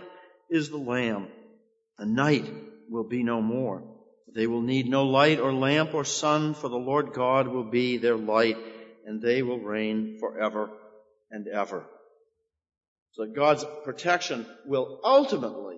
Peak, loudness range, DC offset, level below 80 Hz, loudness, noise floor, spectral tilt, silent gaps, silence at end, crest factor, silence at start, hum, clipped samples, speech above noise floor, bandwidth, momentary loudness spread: -6 dBFS; 7 LU; under 0.1%; -72 dBFS; -26 LUFS; -72 dBFS; -5 dB/octave; 12.88-12.96 s, 13.02-13.06 s; 0 s; 22 dB; 0 s; none; under 0.1%; 46 dB; 8 kHz; 16 LU